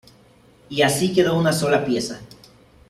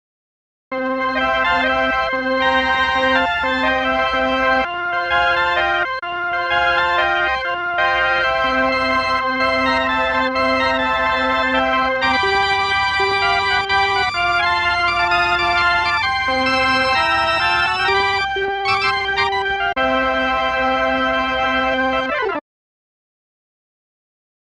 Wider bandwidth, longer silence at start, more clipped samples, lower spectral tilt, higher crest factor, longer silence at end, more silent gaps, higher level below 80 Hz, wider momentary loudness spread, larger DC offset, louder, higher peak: first, 15 kHz vs 11.5 kHz; about the same, 0.7 s vs 0.7 s; neither; about the same, -4.5 dB/octave vs -3.5 dB/octave; about the same, 18 dB vs 14 dB; second, 0.65 s vs 2.1 s; neither; second, -54 dBFS vs -42 dBFS; first, 12 LU vs 3 LU; neither; second, -20 LUFS vs -17 LUFS; about the same, -4 dBFS vs -4 dBFS